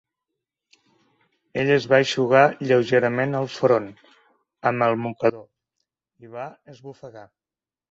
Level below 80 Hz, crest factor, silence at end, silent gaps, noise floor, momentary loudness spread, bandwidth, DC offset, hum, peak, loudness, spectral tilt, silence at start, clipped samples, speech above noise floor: -66 dBFS; 20 dB; 0.65 s; none; under -90 dBFS; 23 LU; 7.8 kHz; under 0.1%; none; -2 dBFS; -21 LUFS; -6 dB/octave; 1.55 s; under 0.1%; over 69 dB